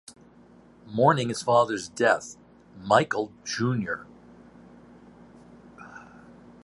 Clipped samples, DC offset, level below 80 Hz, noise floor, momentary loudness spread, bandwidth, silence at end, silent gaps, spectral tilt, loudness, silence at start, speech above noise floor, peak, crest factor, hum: under 0.1%; under 0.1%; -64 dBFS; -54 dBFS; 23 LU; 11.5 kHz; 0.6 s; none; -5 dB/octave; -25 LUFS; 0.85 s; 29 dB; -4 dBFS; 24 dB; none